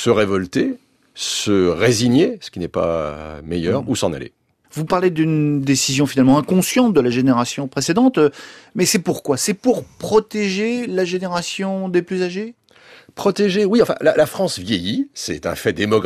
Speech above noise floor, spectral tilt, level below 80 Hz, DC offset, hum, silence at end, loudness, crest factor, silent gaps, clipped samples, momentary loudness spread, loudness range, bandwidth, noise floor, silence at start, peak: 29 dB; -5 dB/octave; -50 dBFS; under 0.1%; none; 0 s; -18 LUFS; 16 dB; none; under 0.1%; 10 LU; 5 LU; 15 kHz; -47 dBFS; 0 s; -2 dBFS